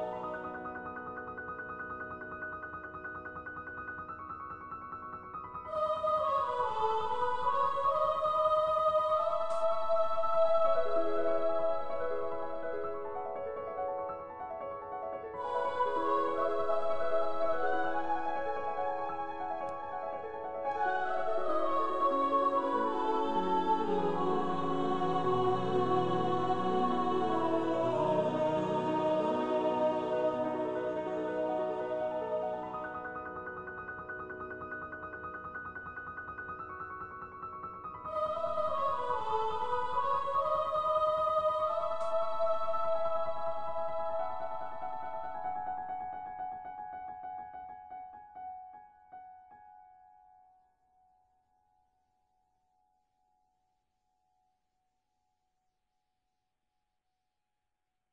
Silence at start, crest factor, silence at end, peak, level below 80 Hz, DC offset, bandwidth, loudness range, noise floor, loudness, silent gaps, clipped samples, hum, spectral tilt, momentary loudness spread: 0 s; 16 dB; 0 s; -18 dBFS; -66 dBFS; under 0.1%; 9.6 kHz; 12 LU; -88 dBFS; -34 LUFS; none; under 0.1%; none; -6.5 dB/octave; 13 LU